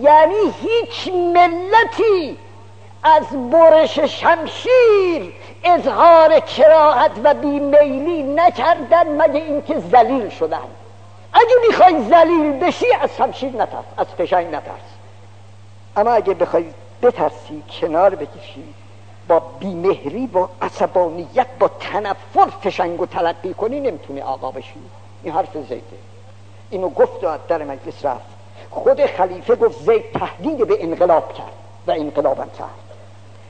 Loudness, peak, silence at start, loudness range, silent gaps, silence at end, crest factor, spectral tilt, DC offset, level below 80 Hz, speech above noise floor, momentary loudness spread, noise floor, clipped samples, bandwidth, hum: -16 LUFS; 0 dBFS; 0 s; 11 LU; none; 0.55 s; 16 dB; -6 dB/octave; 0.7%; -60 dBFS; 26 dB; 17 LU; -42 dBFS; under 0.1%; 8.8 kHz; none